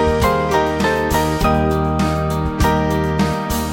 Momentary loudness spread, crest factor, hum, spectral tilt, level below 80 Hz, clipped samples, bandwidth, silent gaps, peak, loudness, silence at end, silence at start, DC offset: 3 LU; 14 dB; none; -6 dB/octave; -26 dBFS; under 0.1%; 17 kHz; none; -2 dBFS; -17 LUFS; 0 s; 0 s; under 0.1%